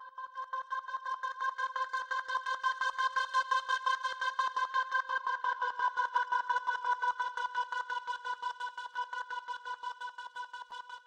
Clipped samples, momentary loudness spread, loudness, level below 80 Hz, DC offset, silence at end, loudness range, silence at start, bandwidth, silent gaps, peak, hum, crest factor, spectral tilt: under 0.1%; 10 LU; -35 LUFS; -82 dBFS; under 0.1%; 0.05 s; 6 LU; 0 s; 10 kHz; none; -18 dBFS; none; 16 dB; 2 dB/octave